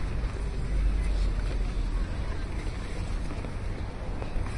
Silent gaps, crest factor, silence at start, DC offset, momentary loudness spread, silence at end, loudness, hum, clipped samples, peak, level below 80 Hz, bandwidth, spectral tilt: none; 12 dB; 0 s; under 0.1%; 6 LU; 0 s; -34 LUFS; none; under 0.1%; -16 dBFS; -30 dBFS; 11 kHz; -6.5 dB/octave